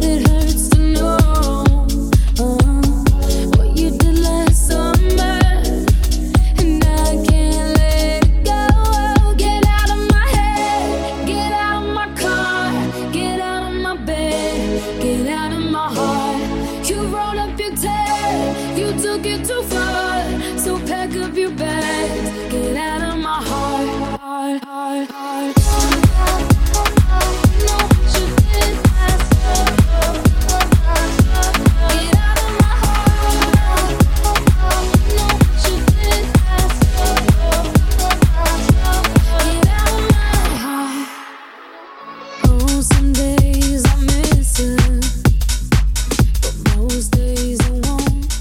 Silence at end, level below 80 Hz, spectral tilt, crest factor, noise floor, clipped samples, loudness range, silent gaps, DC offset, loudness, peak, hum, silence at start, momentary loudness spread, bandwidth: 0 s; -18 dBFS; -5 dB/octave; 14 dB; -37 dBFS; under 0.1%; 5 LU; none; under 0.1%; -16 LUFS; 0 dBFS; none; 0 s; 7 LU; 17 kHz